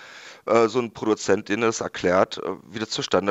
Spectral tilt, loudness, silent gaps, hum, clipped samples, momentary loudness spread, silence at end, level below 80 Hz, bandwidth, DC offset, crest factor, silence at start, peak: -4 dB/octave; -23 LUFS; none; none; under 0.1%; 12 LU; 0 s; -64 dBFS; 8.2 kHz; under 0.1%; 20 dB; 0 s; -4 dBFS